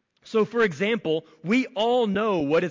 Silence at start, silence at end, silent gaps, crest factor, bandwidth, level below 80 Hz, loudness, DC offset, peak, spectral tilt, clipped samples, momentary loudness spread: 0.25 s; 0 s; none; 12 dB; 7.6 kHz; -62 dBFS; -24 LUFS; under 0.1%; -12 dBFS; -6 dB/octave; under 0.1%; 5 LU